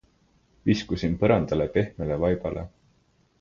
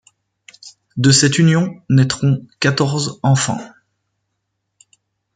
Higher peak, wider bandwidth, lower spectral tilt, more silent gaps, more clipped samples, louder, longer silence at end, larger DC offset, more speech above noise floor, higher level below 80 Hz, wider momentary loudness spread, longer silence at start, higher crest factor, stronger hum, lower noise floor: second, -6 dBFS vs 0 dBFS; second, 7.4 kHz vs 9.4 kHz; first, -7.5 dB/octave vs -4.5 dB/octave; neither; neither; second, -26 LUFS vs -15 LUFS; second, 0.7 s vs 1.65 s; neither; second, 40 dB vs 59 dB; first, -44 dBFS vs -54 dBFS; about the same, 10 LU vs 8 LU; about the same, 0.65 s vs 0.65 s; about the same, 20 dB vs 16 dB; neither; second, -65 dBFS vs -74 dBFS